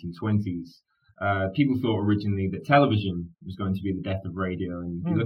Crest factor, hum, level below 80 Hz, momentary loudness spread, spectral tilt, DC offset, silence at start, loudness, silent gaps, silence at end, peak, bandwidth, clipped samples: 20 dB; none; -56 dBFS; 12 LU; -9 dB/octave; under 0.1%; 0 s; -26 LUFS; none; 0 s; -6 dBFS; 6 kHz; under 0.1%